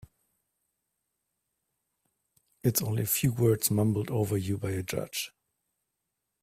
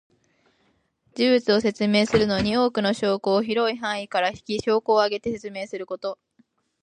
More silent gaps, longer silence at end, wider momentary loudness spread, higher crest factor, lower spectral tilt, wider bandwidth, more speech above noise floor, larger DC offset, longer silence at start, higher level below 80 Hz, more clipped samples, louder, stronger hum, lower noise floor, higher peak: neither; first, 1.15 s vs 0.7 s; second, 8 LU vs 12 LU; about the same, 20 dB vs 18 dB; about the same, -5 dB/octave vs -5 dB/octave; first, 16 kHz vs 10.5 kHz; first, 56 dB vs 45 dB; neither; first, 2.65 s vs 1.15 s; second, -60 dBFS vs -54 dBFS; neither; second, -29 LUFS vs -23 LUFS; neither; first, -84 dBFS vs -67 dBFS; second, -12 dBFS vs -6 dBFS